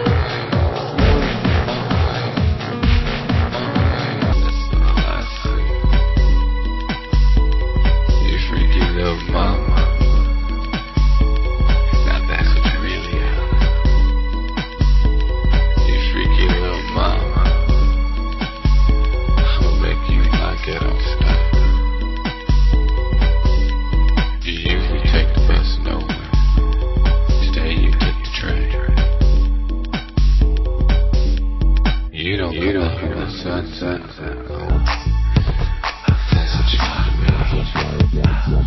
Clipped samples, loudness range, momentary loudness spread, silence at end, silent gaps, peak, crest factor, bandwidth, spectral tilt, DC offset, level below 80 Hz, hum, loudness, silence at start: under 0.1%; 2 LU; 6 LU; 0 s; none; 0 dBFS; 14 dB; 6 kHz; -7 dB/octave; under 0.1%; -16 dBFS; none; -18 LUFS; 0 s